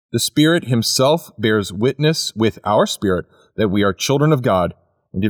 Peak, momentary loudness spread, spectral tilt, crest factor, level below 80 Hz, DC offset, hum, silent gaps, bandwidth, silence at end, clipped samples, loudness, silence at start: -4 dBFS; 6 LU; -5 dB/octave; 14 dB; -50 dBFS; under 0.1%; none; none; 19 kHz; 0 s; under 0.1%; -17 LUFS; 0.15 s